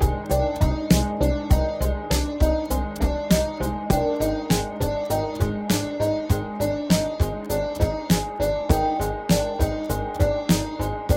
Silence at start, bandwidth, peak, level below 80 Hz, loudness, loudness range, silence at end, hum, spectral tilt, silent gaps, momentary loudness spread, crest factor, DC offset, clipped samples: 0 s; 17 kHz; -4 dBFS; -28 dBFS; -24 LUFS; 1 LU; 0 s; none; -6 dB/octave; none; 5 LU; 18 dB; under 0.1%; under 0.1%